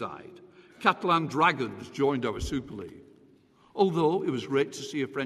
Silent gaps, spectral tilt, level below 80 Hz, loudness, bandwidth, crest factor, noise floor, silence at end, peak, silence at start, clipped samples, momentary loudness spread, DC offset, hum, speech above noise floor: none; -5.5 dB/octave; -52 dBFS; -28 LUFS; 13 kHz; 20 dB; -60 dBFS; 0 s; -8 dBFS; 0 s; under 0.1%; 17 LU; under 0.1%; none; 32 dB